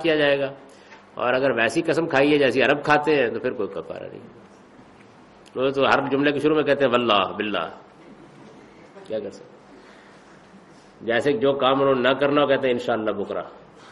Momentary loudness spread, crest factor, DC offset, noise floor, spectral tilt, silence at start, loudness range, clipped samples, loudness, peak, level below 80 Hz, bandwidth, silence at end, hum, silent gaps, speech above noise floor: 15 LU; 20 dB; under 0.1%; -49 dBFS; -5.5 dB/octave; 0 s; 10 LU; under 0.1%; -21 LUFS; -4 dBFS; -60 dBFS; 11.5 kHz; 0 s; none; none; 28 dB